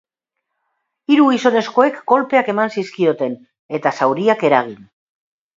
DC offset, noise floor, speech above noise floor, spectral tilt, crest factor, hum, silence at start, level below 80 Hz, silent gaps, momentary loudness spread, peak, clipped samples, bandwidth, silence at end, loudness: under 0.1%; -78 dBFS; 62 dB; -6 dB/octave; 18 dB; none; 1.1 s; -68 dBFS; 3.59-3.69 s; 11 LU; 0 dBFS; under 0.1%; 7.6 kHz; 0.85 s; -16 LUFS